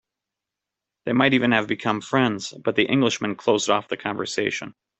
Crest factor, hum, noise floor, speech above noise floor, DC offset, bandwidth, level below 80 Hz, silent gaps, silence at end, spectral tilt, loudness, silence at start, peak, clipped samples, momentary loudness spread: 20 dB; none; -86 dBFS; 64 dB; under 0.1%; 8.4 kHz; -62 dBFS; none; 0.3 s; -4.5 dB/octave; -22 LUFS; 1.05 s; -2 dBFS; under 0.1%; 8 LU